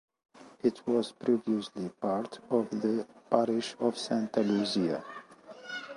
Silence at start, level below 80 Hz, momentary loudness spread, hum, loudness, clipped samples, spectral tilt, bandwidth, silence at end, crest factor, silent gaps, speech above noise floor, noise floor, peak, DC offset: 0.4 s; -74 dBFS; 12 LU; none; -31 LUFS; under 0.1%; -5.5 dB/octave; 11.5 kHz; 0 s; 22 dB; none; 20 dB; -50 dBFS; -10 dBFS; under 0.1%